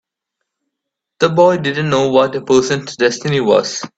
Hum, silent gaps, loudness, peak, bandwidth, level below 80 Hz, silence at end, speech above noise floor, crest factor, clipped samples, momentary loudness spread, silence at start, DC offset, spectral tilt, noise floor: none; none; -14 LUFS; 0 dBFS; 8.2 kHz; -54 dBFS; 0.1 s; 66 dB; 16 dB; under 0.1%; 5 LU; 1.2 s; under 0.1%; -5 dB/octave; -79 dBFS